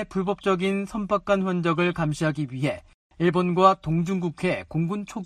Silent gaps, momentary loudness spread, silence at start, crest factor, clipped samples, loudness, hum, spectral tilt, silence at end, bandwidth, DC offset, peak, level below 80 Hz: 2.94-3.10 s; 8 LU; 0 s; 20 dB; under 0.1%; -24 LUFS; none; -7 dB/octave; 0 s; 10.5 kHz; under 0.1%; -6 dBFS; -52 dBFS